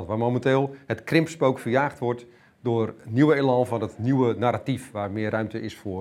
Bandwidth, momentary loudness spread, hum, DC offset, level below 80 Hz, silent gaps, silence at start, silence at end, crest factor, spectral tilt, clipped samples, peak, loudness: 14 kHz; 10 LU; none; under 0.1%; -62 dBFS; none; 0 s; 0 s; 20 dB; -7.5 dB/octave; under 0.1%; -4 dBFS; -25 LUFS